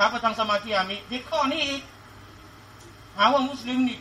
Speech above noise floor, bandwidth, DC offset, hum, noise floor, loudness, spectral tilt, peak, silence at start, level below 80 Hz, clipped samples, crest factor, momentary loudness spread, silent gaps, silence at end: 22 dB; 15.5 kHz; under 0.1%; none; -47 dBFS; -25 LUFS; -3.5 dB/octave; -6 dBFS; 0 s; -56 dBFS; under 0.1%; 20 dB; 11 LU; none; 0 s